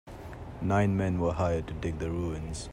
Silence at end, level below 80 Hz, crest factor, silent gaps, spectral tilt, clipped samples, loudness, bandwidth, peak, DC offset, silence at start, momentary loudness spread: 0 s; -44 dBFS; 16 dB; none; -7 dB/octave; under 0.1%; -30 LUFS; 11 kHz; -14 dBFS; under 0.1%; 0.05 s; 15 LU